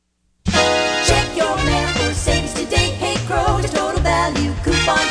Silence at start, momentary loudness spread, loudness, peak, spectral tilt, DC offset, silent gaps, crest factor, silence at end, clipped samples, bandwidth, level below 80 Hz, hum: 0.45 s; 4 LU; -17 LUFS; 0 dBFS; -4 dB/octave; under 0.1%; none; 16 dB; 0 s; under 0.1%; 11 kHz; -28 dBFS; none